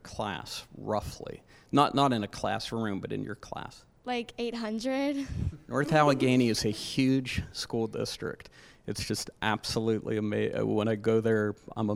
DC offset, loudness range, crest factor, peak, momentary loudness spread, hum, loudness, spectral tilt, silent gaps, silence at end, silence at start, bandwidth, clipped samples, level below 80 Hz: under 0.1%; 5 LU; 22 dB; -8 dBFS; 15 LU; none; -30 LUFS; -5.5 dB/octave; none; 0 s; 0.05 s; 16 kHz; under 0.1%; -52 dBFS